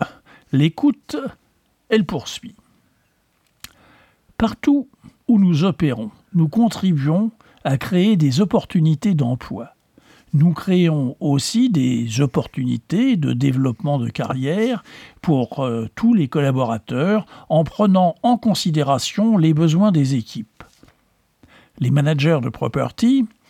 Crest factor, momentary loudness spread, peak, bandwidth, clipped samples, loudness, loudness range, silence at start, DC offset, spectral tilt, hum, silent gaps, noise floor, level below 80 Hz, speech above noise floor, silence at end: 14 dB; 11 LU; -4 dBFS; 14.5 kHz; under 0.1%; -19 LUFS; 6 LU; 0 s; under 0.1%; -7 dB/octave; none; none; -64 dBFS; -52 dBFS; 46 dB; 0.25 s